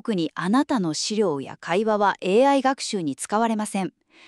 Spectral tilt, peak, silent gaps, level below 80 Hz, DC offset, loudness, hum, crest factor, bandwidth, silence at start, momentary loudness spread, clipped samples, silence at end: -4.5 dB/octave; -6 dBFS; none; -70 dBFS; under 0.1%; -23 LUFS; none; 16 dB; 12.5 kHz; 0.05 s; 8 LU; under 0.1%; 0.4 s